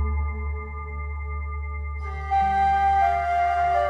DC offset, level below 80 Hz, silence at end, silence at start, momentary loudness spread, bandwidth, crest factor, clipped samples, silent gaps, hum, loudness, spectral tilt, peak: under 0.1%; -32 dBFS; 0 s; 0 s; 12 LU; 7.8 kHz; 14 dB; under 0.1%; none; none; -25 LUFS; -7 dB/octave; -10 dBFS